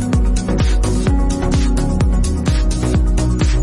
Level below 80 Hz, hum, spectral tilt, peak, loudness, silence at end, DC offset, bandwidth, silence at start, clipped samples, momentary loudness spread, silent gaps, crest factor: -16 dBFS; none; -6 dB/octave; -6 dBFS; -17 LUFS; 0 s; under 0.1%; 11.5 kHz; 0 s; under 0.1%; 1 LU; none; 8 dB